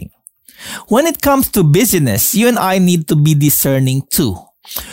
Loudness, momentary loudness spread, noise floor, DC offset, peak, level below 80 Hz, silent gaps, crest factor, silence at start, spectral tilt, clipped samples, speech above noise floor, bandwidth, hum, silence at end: -12 LUFS; 15 LU; -45 dBFS; under 0.1%; -2 dBFS; -40 dBFS; none; 12 dB; 0 s; -5 dB/octave; under 0.1%; 33 dB; 16.5 kHz; none; 0 s